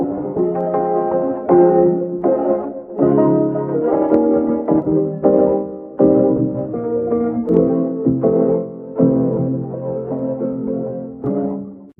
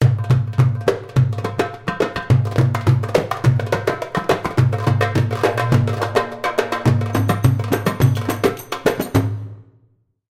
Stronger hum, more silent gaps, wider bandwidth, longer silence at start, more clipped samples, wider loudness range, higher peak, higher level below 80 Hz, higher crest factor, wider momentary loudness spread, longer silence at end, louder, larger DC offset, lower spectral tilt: neither; neither; second, 2.9 kHz vs 16 kHz; about the same, 0 s vs 0 s; neither; about the same, 3 LU vs 1 LU; about the same, 0 dBFS vs -2 dBFS; second, -50 dBFS vs -42 dBFS; about the same, 16 dB vs 16 dB; first, 10 LU vs 5 LU; second, 0.1 s vs 0.7 s; about the same, -17 LUFS vs -19 LUFS; neither; first, -13.5 dB/octave vs -7 dB/octave